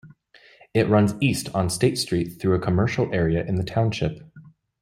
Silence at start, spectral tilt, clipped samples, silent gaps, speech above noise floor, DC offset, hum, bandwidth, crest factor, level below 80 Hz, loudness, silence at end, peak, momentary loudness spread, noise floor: 0.05 s; -6 dB/octave; under 0.1%; none; 32 dB; under 0.1%; none; 15.5 kHz; 18 dB; -48 dBFS; -23 LUFS; 0.35 s; -4 dBFS; 6 LU; -54 dBFS